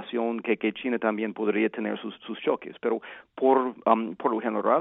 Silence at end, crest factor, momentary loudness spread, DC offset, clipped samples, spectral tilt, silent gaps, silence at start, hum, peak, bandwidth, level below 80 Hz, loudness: 0 s; 22 dB; 9 LU; under 0.1%; under 0.1%; -9.5 dB/octave; none; 0 s; none; -4 dBFS; 4 kHz; -76 dBFS; -27 LUFS